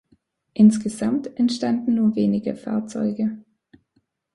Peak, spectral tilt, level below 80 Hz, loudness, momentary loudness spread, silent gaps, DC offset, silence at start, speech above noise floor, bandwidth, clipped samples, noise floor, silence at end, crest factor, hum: -4 dBFS; -7 dB/octave; -60 dBFS; -21 LUFS; 11 LU; none; under 0.1%; 0.55 s; 48 dB; 11.5 kHz; under 0.1%; -69 dBFS; 0.95 s; 18 dB; none